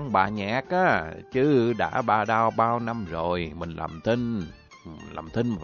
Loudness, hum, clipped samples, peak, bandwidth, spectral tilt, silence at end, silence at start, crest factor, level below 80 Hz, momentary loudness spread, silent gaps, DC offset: -25 LUFS; none; under 0.1%; -8 dBFS; 7 kHz; -7 dB/octave; 0 s; 0 s; 18 dB; -50 dBFS; 12 LU; none; under 0.1%